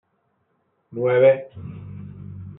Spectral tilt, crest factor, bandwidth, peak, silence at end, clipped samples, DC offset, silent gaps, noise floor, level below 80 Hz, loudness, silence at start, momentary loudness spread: -6.5 dB/octave; 18 dB; 3.8 kHz; -6 dBFS; 0.05 s; under 0.1%; under 0.1%; none; -69 dBFS; -60 dBFS; -19 LUFS; 0.95 s; 22 LU